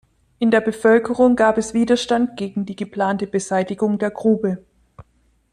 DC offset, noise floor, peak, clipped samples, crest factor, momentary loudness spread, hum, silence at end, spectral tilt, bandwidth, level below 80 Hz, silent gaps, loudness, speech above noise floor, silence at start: under 0.1%; -61 dBFS; -4 dBFS; under 0.1%; 16 dB; 10 LU; none; 0.5 s; -5.5 dB/octave; 11 kHz; -54 dBFS; none; -19 LUFS; 43 dB; 0.4 s